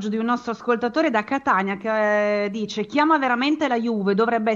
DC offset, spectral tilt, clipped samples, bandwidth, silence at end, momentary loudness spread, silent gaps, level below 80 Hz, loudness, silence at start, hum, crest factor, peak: under 0.1%; -5.5 dB/octave; under 0.1%; 7.6 kHz; 0 s; 5 LU; none; -64 dBFS; -21 LUFS; 0 s; none; 16 dB; -6 dBFS